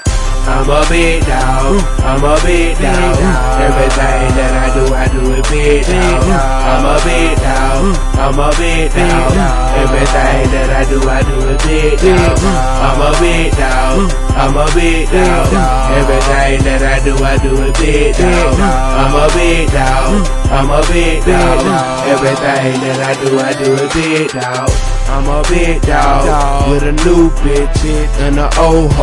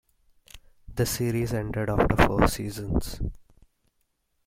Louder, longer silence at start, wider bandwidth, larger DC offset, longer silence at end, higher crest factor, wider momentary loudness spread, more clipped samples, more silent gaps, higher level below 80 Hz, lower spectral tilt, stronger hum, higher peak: first, -11 LUFS vs -26 LUFS; second, 0 s vs 0.55 s; second, 11.5 kHz vs 16.5 kHz; neither; second, 0 s vs 1.05 s; second, 10 dB vs 26 dB; second, 4 LU vs 14 LU; neither; neither; first, -12 dBFS vs -36 dBFS; about the same, -5 dB/octave vs -5.5 dB/octave; neither; about the same, 0 dBFS vs -2 dBFS